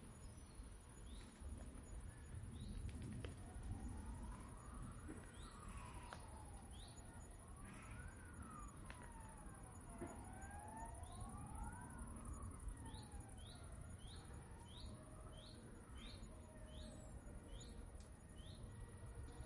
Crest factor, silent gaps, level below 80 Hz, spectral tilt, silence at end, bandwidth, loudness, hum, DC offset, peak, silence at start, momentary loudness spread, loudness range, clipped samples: 20 dB; none; -58 dBFS; -5 dB/octave; 0 s; 11.5 kHz; -56 LUFS; none; under 0.1%; -34 dBFS; 0 s; 6 LU; 4 LU; under 0.1%